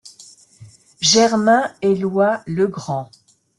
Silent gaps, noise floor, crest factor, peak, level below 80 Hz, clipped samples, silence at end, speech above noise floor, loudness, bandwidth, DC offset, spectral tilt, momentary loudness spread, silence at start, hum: none; -46 dBFS; 16 dB; -2 dBFS; -60 dBFS; under 0.1%; 0.55 s; 29 dB; -17 LUFS; 12 kHz; under 0.1%; -3.5 dB/octave; 12 LU; 0.05 s; none